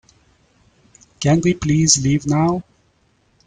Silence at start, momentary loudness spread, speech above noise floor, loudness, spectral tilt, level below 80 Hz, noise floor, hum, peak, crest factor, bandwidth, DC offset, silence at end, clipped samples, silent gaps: 1.2 s; 8 LU; 44 dB; -17 LUFS; -4.5 dB/octave; -46 dBFS; -60 dBFS; none; 0 dBFS; 20 dB; 9.6 kHz; under 0.1%; 0.85 s; under 0.1%; none